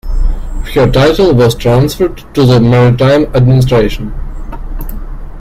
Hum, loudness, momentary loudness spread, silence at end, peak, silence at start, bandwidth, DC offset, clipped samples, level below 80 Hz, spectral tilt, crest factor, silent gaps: none; -9 LUFS; 19 LU; 0 s; 0 dBFS; 0.05 s; 15 kHz; under 0.1%; under 0.1%; -18 dBFS; -7 dB/octave; 10 dB; none